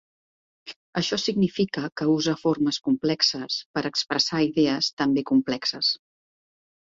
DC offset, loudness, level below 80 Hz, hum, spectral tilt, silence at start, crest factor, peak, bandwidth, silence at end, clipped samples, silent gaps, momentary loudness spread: under 0.1%; -24 LUFS; -64 dBFS; none; -4.5 dB/octave; 0.65 s; 18 dB; -6 dBFS; 7.8 kHz; 0.9 s; under 0.1%; 0.76-0.93 s, 3.66-3.74 s, 4.93-4.97 s; 6 LU